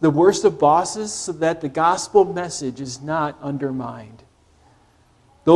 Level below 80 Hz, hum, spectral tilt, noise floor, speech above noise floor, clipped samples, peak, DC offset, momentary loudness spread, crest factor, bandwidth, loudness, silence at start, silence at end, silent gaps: -56 dBFS; none; -5 dB/octave; -56 dBFS; 36 dB; under 0.1%; 0 dBFS; under 0.1%; 13 LU; 20 dB; 12 kHz; -20 LUFS; 0 s; 0 s; none